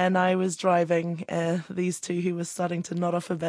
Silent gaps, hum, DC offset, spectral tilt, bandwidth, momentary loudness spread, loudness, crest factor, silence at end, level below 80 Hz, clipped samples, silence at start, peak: none; none; under 0.1%; -5.5 dB/octave; 11 kHz; 7 LU; -27 LUFS; 16 dB; 0 s; -72 dBFS; under 0.1%; 0 s; -10 dBFS